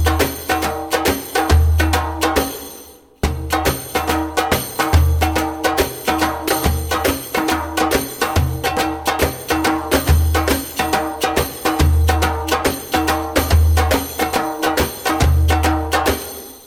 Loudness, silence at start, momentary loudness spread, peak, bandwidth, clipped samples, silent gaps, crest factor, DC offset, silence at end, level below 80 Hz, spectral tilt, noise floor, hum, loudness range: -18 LUFS; 0 s; 5 LU; 0 dBFS; 17 kHz; under 0.1%; none; 18 dB; under 0.1%; 0 s; -24 dBFS; -4.5 dB/octave; -40 dBFS; none; 2 LU